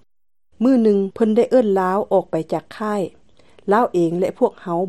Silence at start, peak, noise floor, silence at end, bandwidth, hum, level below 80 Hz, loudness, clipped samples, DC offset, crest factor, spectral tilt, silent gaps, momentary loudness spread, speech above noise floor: 0.6 s; -4 dBFS; -53 dBFS; 0 s; 12.5 kHz; none; -62 dBFS; -19 LUFS; under 0.1%; 0.3%; 16 dB; -8 dB/octave; none; 9 LU; 35 dB